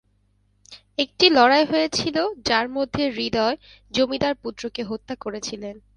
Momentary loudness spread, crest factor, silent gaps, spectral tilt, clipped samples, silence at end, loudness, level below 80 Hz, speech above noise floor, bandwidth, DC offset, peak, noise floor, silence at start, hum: 15 LU; 22 dB; none; -3.5 dB/octave; under 0.1%; 0.2 s; -22 LUFS; -54 dBFS; 42 dB; 11 kHz; under 0.1%; 0 dBFS; -64 dBFS; 0.7 s; 50 Hz at -55 dBFS